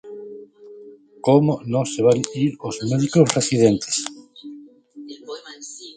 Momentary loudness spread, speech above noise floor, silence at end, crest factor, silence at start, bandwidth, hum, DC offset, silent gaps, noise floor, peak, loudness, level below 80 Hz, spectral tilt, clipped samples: 22 LU; 26 dB; 0.05 s; 20 dB; 0.05 s; 9.6 kHz; none; under 0.1%; none; -44 dBFS; 0 dBFS; -19 LUFS; -58 dBFS; -5.5 dB/octave; under 0.1%